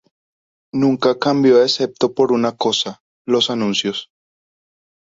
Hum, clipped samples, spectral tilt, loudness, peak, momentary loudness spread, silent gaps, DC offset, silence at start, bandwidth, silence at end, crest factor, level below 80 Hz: none; under 0.1%; -4.5 dB/octave; -17 LUFS; -2 dBFS; 12 LU; 3.00-3.25 s; under 0.1%; 0.75 s; 7.8 kHz; 1.1 s; 16 dB; -62 dBFS